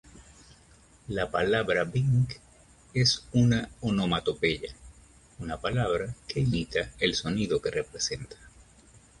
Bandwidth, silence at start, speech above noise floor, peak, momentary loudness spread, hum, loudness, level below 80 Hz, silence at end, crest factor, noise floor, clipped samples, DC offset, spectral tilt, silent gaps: 11.5 kHz; 0.15 s; 30 dB; -10 dBFS; 11 LU; none; -28 LUFS; -50 dBFS; 0.7 s; 18 dB; -57 dBFS; under 0.1%; under 0.1%; -5 dB/octave; none